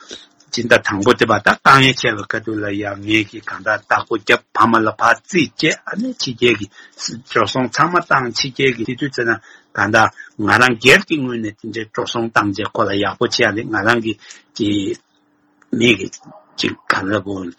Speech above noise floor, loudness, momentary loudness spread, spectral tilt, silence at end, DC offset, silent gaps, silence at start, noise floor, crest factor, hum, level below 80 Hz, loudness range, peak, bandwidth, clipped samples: 42 dB; -16 LUFS; 13 LU; -4 dB/octave; 0.05 s; under 0.1%; none; 0.1 s; -59 dBFS; 18 dB; none; -52 dBFS; 4 LU; 0 dBFS; 16 kHz; under 0.1%